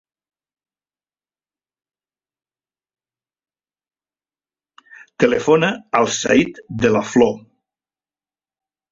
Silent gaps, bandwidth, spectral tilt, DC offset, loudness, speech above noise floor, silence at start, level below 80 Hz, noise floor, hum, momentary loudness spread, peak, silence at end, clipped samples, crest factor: none; 7.8 kHz; -4.5 dB/octave; under 0.1%; -17 LUFS; over 74 dB; 5.2 s; -56 dBFS; under -90 dBFS; 50 Hz at -55 dBFS; 5 LU; -2 dBFS; 1.55 s; under 0.1%; 20 dB